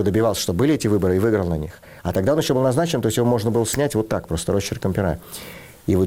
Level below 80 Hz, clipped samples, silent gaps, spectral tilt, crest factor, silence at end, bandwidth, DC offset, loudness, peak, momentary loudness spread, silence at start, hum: -42 dBFS; under 0.1%; none; -6 dB/octave; 12 dB; 0 s; 17 kHz; 0.1%; -21 LUFS; -8 dBFS; 12 LU; 0 s; none